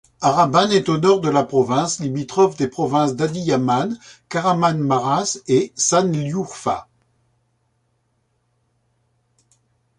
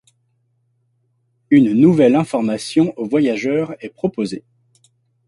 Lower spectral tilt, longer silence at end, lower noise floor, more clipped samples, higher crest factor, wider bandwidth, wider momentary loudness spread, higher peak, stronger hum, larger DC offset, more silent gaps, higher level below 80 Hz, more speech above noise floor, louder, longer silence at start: second, -5 dB/octave vs -7 dB/octave; first, 3.15 s vs 0.9 s; about the same, -67 dBFS vs -65 dBFS; neither; about the same, 18 dB vs 16 dB; about the same, 11 kHz vs 11.5 kHz; second, 8 LU vs 13 LU; about the same, -2 dBFS vs -2 dBFS; neither; neither; neither; about the same, -58 dBFS vs -60 dBFS; about the same, 49 dB vs 49 dB; second, -19 LUFS vs -16 LUFS; second, 0.2 s vs 1.5 s